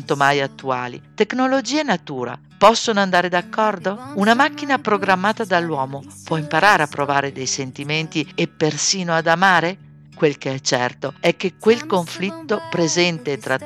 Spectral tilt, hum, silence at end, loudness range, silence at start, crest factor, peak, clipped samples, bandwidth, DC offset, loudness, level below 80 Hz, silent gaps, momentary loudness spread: -4 dB/octave; none; 0 s; 2 LU; 0 s; 18 dB; -2 dBFS; under 0.1%; 16 kHz; under 0.1%; -19 LUFS; -62 dBFS; none; 11 LU